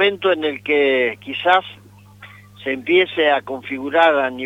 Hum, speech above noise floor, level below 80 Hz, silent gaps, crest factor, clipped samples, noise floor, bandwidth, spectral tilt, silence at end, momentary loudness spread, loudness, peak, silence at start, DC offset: 50 Hz at -45 dBFS; 25 dB; -64 dBFS; none; 16 dB; under 0.1%; -43 dBFS; 9.2 kHz; -5.5 dB/octave; 0 s; 11 LU; -18 LUFS; -2 dBFS; 0 s; under 0.1%